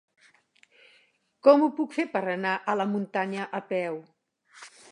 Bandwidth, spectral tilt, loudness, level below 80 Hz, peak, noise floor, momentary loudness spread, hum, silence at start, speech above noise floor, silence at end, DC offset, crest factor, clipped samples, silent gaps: 10.5 kHz; -6.5 dB/octave; -26 LUFS; -84 dBFS; -4 dBFS; -65 dBFS; 15 LU; none; 1.45 s; 39 dB; 0.25 s; under 0.1%; 24 dB; under 0.1%; none